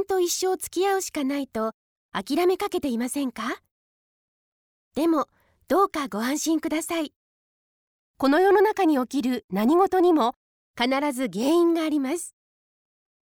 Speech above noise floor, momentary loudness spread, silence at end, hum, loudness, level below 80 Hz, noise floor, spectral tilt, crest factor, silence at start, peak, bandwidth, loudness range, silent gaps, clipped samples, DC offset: over 67 dB; 12 LU; 1 s; none; -24 LUFS; -64 dBFS; under -90 dBFS; -3.5 dB/octave; 16 dB; 0 s; -10 dBFS; 18.5 kHz; 6 LU; 1.74-2.09 s, 3.71-4.91 s, 7.16-8.14 s, 9.44-9.48 s, 10.36-10.74 s; under 0.1%; under 0.1%